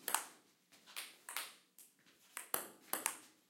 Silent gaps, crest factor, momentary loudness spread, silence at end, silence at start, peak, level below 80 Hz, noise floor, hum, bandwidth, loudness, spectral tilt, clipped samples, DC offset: none; 34 dB; 22 LU; 0.2 s; 0 s; -14 dBFS; under -90 dBFS; -69 dBFS; none; 17 kHz; -44 LUFS; 1 dB/octave; under 0.1%; under 0.1%